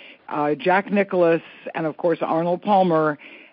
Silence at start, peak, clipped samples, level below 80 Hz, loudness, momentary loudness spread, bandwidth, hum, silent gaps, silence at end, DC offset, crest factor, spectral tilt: 0 s; -6 dBFS; under 0.1%; -72 dBFS; -21 LUFS; 9 LU; 5.6 kHz; none; none; 0.15 s; under 0.1%; 14 dB; -5 dB/octave